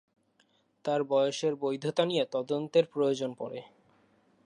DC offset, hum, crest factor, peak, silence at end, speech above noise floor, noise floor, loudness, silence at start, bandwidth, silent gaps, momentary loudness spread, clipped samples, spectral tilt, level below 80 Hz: under 0.1%; none; 20 dB; -12 dBFS; 0.8 s; 40 dB; -70 dBFS; -30 LUFS; 0.85 s; 10.5 kHz; none; 12 LU; under 0.1%; -5.5 dB/octave; -84 dBFS